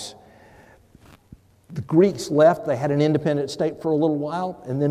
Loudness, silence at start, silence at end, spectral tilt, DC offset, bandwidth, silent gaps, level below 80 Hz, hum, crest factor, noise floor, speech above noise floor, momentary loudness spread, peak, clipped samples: -21 LUFS; 0 s; 0 s; -7 dB/octave; under 0.1%; 14 kHz; none; -60 dBFS; none; 18 dB; -51 dBFS; 31 dB; 11 LU; -4 dBFS; under 0.1%